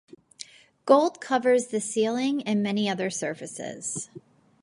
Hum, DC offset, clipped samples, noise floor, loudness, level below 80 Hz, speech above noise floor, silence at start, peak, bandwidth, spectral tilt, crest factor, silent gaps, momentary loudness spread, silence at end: none; under 0.1%; under 0.1%; -47 dBFS; -26 LUFS; -76 dBFS; 22 dB; 0.4 s; -6 dBFS; 11.5 kHz; -4 dB/octave; 22 dB; none; 21 LU; 0.45 s